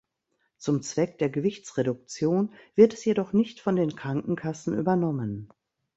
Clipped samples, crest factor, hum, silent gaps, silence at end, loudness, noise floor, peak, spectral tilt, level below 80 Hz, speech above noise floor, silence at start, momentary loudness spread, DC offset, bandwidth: under 0.1%; 20 dB; none; none; 0.5 s; -27 LUFS; -76 dBFS; -6 dBFS; -7 dB/octave; -64 dBFS; 50 dB; 0.6 s; 10 LU; under 0.1%; 8 kHz